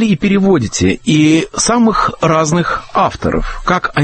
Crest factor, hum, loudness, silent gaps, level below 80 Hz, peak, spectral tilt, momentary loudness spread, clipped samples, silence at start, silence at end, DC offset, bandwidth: 12 dB; none; -13 LUFS; none; -30 dBFS; 0 dBFS; -5 dB/octave; 5 LU; under 0.1%; 0 s; 0 s; under 0.1%; 8.8 kHz